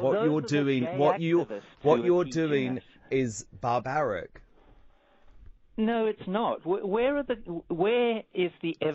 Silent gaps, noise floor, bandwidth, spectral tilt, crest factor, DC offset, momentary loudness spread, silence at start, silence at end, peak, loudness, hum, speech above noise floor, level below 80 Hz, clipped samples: none; -57 dBFS; 7.4 kHz; -5.5 dB/octave; 18 dB; under 0.1%; 9 LU; 0 s; 0 s; -10 dBFS; -28 LUFS; none; 30 dB; -58 dBFS; under 0.1%